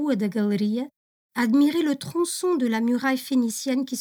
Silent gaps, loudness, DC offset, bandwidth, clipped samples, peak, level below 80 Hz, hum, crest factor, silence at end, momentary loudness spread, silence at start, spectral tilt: 0.96-1.30 s; -24 LUFS; under 0.1%; over 20 kHz; under 0.1%; -12 dBFS; -74 dBFS; none; 12 dB; 0 s; 7 LU; 0 s; -4.5 dB/octave